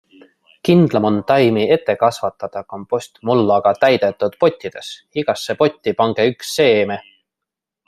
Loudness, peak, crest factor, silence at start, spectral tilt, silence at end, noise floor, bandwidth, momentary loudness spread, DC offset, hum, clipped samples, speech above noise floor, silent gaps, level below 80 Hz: -17 LUFS; 0 dBFS; 16 dB; 0.65 s; -6 dB/octave; 0.85 s; -84 dBFS; 14.5 kHz; 13 LU; under 0.1%; none; under 0.1%; 67 dB; none; -60 dBFS